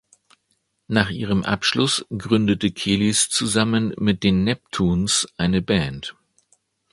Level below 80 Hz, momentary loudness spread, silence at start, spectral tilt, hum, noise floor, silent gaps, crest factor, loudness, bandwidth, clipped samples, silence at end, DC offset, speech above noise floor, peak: -44 dBFS; 5 LU; 0.9 s; -4 dB/octave; none; -70 dBFS; none; 22 dB; -20 LUFS; 11.5 kHz; under 0.1%; 0.8 s; under 0.1%; 50 dB; 0 dBFS